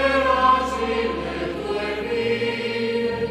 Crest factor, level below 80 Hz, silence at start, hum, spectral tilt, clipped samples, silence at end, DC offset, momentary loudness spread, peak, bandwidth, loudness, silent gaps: 16 dB; -42 dBFS; 0 s; none; -5 dB/octave; under 0.1%; 0 s; under 0.1%; 9 LU; -6 dBFS; 13 kHz; -22 LUFS; none